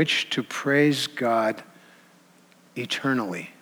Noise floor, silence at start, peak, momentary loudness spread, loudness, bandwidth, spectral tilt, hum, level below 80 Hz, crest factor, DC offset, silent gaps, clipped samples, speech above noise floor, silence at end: -56 dBFS; 0 s; -8 dBFS; 14 LU; -24 LUFS; over 20 kHz; -4.5 dB/octave; none; -84 dBFS; 18 dB; under 0.1%; none; under 0.1%; 32 dB; 0.1 s